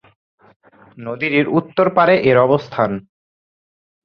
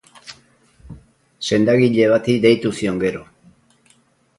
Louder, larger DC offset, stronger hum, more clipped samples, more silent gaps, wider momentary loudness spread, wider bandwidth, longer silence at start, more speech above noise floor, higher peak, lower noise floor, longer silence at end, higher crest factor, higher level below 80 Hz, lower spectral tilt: about the same, -15 LUFS vs -17 LUFS; neither; neither; neither; neither; second, 15 LU vs 23 LU; second, 6.4 kHz vs 11.5 kHz; first, 0.95 s vs 0.25 s; first, over 75 dB vs 42 dB; about the same, -2 dBFS vs -2 dBFS; first, under -90 dBFS vs -58 dBFS; about the same, 1.05 s vs 1.15 s; about the same, 16 dB vs 18 dB; about the same, -56 dBFS vs -52 dBFS; first, -8.5 dB/octave vs -6 dB/octave